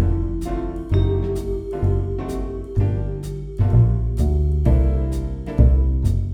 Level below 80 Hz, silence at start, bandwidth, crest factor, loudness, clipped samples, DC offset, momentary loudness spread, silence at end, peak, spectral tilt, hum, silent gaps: -22 dBFS; 0 s; 9.6 kHz; 16 dB; -21 LUFS; under 0.1%; under 0.1%; 10 LU; 0 s; -2 dBFS; -9.5 dB/octave; none; none